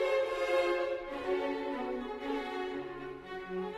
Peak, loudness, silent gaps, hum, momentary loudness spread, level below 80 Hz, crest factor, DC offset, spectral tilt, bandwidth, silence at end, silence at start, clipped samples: -18 dBFS; -35 LUFS; none; none; 11 LU; -60 dBFS; 16 dB; under 0.1%; -5 dB/octave; 13.5 kHz; 0 s; 0 s; under 0.1%